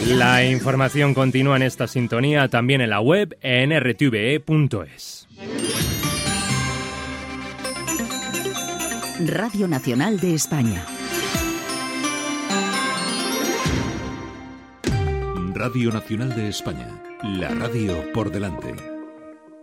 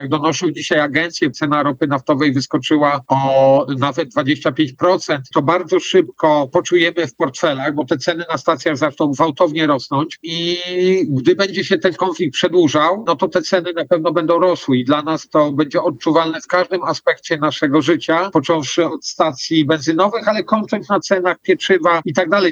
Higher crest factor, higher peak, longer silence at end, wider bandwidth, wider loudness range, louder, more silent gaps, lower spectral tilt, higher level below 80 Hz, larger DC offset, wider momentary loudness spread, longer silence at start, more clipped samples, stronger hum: first, 20 dB vs 14 dB; about the same, -2 dBFS vs 0 dBFS; about the same, 0 s vs 0 s; first, 16.5 kHz vs 8 kHz; first, 7 LU vs 1 LU; second, -22 LUFS vs -16 LUFS; neither; about the same, -4.5 dB/octave vs -5 dB/octave; first, -42 dBFS vs -64 dBFS; neither; first, 13 LU vs 5 LU; about the same, 0 s vs 0 s; neither; neither